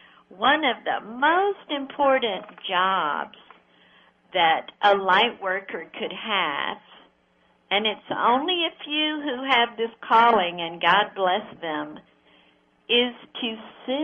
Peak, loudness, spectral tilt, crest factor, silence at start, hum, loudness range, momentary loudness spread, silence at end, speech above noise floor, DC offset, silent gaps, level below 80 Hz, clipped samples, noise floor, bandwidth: -4 dBFS; -23 LUFS; -5 dB/octave; 20 dB; 0.3 s; none; 4 LU; 11 LU; 0 s; 40 dB; under 0.1%; none; -68 dBFS; under 0.1%; -63 dBFS; 7.4 kHz